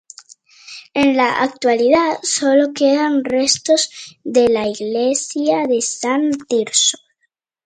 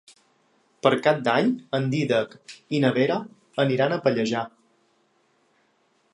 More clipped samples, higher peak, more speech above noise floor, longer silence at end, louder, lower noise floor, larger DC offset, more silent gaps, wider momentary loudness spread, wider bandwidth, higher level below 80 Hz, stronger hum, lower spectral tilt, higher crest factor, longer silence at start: neither; first, 0 dBFS vs -4 dBFS; first, 53 dB vs 43 dB; second, 0.7 s vs 1.65 s; first, -16 LUFS vs -24 LUFS; about the same, -69 dBFS vs -66 dBFS; neither; neither; second, 6 LU vs 9 LU; second, 9.6 kHz vs 11 kHz; first, -58 dBFS vs -72 dBFS; neither; second, -2 dB/octave vs -6.5 dB/octave; second, 16 dB vs 22 dB; second, 0.65 s vs 0.85 s